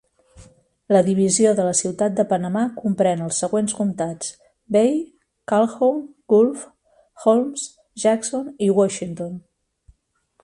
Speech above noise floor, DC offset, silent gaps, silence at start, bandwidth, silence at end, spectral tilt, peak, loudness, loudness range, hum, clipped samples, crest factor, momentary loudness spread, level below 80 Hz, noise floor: 45 dB; under 0.1%; none; 0.4 s; 11.5 kHz; 1.05 s; -5 dB/octave; -4 dBFS; -20 LUFS; 3 LU; none; under 0.1%; 18 dB; 14 LU; -62 dBFS; -64 dBFS